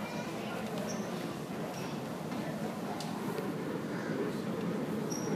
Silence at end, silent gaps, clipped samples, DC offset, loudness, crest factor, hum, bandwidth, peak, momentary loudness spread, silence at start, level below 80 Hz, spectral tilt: 0 s; none; under 0.1%; under 0.1%; -37 LUFS; 14 dB; none; 15.5 kHz; -22 dBFS; 3 LU; 0 s; -68 dBFS; -5.5 dB/octave